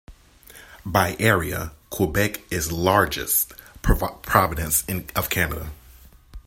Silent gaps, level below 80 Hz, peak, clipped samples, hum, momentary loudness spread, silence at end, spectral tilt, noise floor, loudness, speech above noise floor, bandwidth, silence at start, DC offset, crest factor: none; -34 dBFS; 0 dBFS; under 0.1%; none; 10 LU; 0.05 s; -4 dB/octave; -49 dBFS; -22 LUFS; 26 dB; 16.5 kHz; 0.1 s; under 0.1%; 22 dB